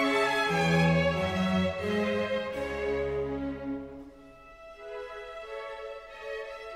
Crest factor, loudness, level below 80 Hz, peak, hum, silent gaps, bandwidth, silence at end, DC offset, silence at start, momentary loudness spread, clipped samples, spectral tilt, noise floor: 18 dB; -29 LUFS; -50 dBFS; -14 dBFS; none; none; 14 kHz; 0 s; under 0.1%; 0 s; 17 LU; under 0.1%; -6 dB/octave; -51 dBFS